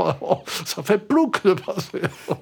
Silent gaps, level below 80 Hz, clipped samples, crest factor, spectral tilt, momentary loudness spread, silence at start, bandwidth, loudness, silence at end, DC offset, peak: none; -66 dBFS; under 0.1%; 18 dB; -5 dB/octave; 9 LU; 0 s; over 20 kHz; -22 LUFS; 0 s; under 0.1%; -4 dBFS